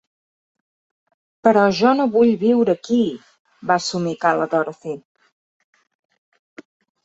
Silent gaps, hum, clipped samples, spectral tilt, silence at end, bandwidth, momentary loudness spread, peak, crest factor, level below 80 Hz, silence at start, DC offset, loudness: 3.39-3.45 s; none; under 0.1%; -5.5 dB/octave; 2.05 s; 8 kHz; 16 LU; -2 dBFS; 18 dB; -66 dBFS; 1.45 s; under 0.1%; -18 LUFS